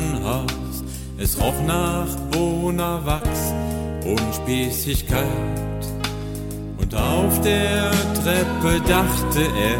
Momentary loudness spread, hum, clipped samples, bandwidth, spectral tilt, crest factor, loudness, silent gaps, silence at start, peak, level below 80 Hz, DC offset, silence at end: 9 LU; none; under 0.1%; 17 kHz; -5 dB/octave; 18 dB; -22 LUFS; none; 0 s; -4 dBFS; -30 dBFS; under 0.1%; 0 s